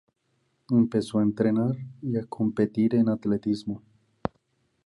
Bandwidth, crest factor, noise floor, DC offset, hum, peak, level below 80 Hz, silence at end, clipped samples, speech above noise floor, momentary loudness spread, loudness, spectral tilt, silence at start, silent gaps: 11.5 kHz; 20 dB; -72 dBFS; under 0.1%; none; -8 dBFS; -60 dBFS; 0.6 s; under 0.1%; 47 dB; 13 LU; -26 LUFS; -8.5 dB/octave; 0.7 s; none